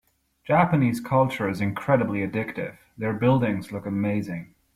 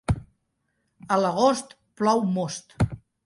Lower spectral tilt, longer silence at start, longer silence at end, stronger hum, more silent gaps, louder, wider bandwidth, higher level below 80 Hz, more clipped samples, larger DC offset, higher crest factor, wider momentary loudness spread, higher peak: first, -8 dB/octave vs -6 dB/octave; first, 0.45 s vs 0.1 s; about the same, 0.3 s vs 0.3 s; neither; neither; about the same, -24 LUFS vs -25 LUFS; first, 15 kHz vs 11.5 kHz; second, -56 dBFS vs -44 dBFS; neither; neither; about the same, 18 dB vs 18 dB; first, 12 LU vs 9 LU; about the same, -6 dBFS vs -8 dBFS